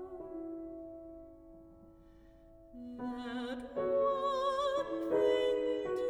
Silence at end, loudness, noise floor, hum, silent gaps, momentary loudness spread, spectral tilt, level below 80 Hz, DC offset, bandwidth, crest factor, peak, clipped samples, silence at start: 0 s; -35 LUFS; -59 dBFS; none; none; 20 LU; -5 dB/octave; -64 dBFS; under 0.1%; 12 kHz; 16 dB; -20 dBFS; under 0.1%; 0 s